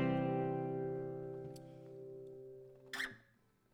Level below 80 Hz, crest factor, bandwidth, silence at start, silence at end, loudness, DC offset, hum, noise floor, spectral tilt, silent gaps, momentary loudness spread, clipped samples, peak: -72 dBFS; 16 dB; 18 kHz; 0 s; 0.55 s; -42 LUFS; under 0.1%; none; -73 dBFS; -7 dB/octave; none; 17 LU; under 0.1%; -26 dBFS